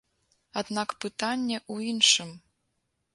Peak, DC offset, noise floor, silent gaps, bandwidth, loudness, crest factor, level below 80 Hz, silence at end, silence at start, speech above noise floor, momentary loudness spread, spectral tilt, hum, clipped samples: -6 dBFS; under 0.1%; -78 dBFS; none; 11.5 kHz; -26 LUFS; 24 dB; -74 dBFS; 0.75 s; 0.55 s; 49 dB; 15 LU; -1.5 dB/octave; none; under 0.1%